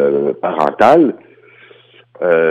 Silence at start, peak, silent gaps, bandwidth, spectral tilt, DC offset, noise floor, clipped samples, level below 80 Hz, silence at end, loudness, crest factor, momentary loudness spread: 0 s; 0 dBFS; none; 9.4 kHz; -7 dB/octave; under 0.1%; -45 dBFS; under 0.1%; -58 dBFS; 0 s; -13 LUFS; 14 dB; 10 LU